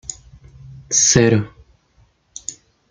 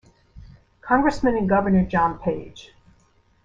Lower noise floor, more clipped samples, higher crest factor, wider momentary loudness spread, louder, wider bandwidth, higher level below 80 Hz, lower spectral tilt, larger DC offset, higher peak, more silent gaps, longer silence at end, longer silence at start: about the same, -57 dBFS vs -60 dBFS; neither; about the same, 20 dB vs 18 dB; first, 22 LU vs 15 LU; first, -14 LUFS vs -21 LUFS; first, 10.5 kHz vs 7.8 kHz; about the same, -48 dBFS vs -44 dBFS; second, -3.5 dB/octave vs -8 dB/octave; neither; first, -2 dBFS vs -6 dBFS; neither; second, 0.35 s vs 0.8 s; second, 0.1 s vs 0.35 s